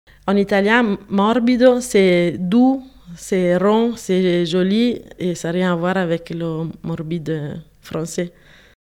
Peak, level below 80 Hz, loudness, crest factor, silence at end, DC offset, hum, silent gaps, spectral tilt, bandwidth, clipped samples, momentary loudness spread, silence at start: 0 dBFS; -52 dBFS; -18 LUFS; 18 dB; 0.65 s; under 0.1%; none; none; -6 dB/octave; 15.5 kHz; under 0.1%; 12 LU; 0.25 s